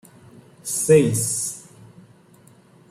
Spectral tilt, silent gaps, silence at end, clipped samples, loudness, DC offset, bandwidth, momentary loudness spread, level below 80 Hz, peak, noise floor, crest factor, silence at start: -5 dB/octave; none; 1.3 s; under 0.1%; -19 LUFS; under 0.1%; 15.5 kHz; 18 LU; -58 dBFS; -4 dBFS; -52 dBFS; 20 dB; 0.65 s